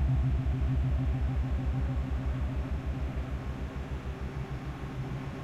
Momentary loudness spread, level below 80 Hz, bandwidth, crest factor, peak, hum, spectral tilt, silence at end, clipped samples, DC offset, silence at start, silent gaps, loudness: 8 LU; -34 dBFS; 7.6 kHz; 12 dB; -20 dBFS; none; -8.5 dB/octave; 0 s; under 0.1%; under 0.1%; 0 s; none; -34 LUFS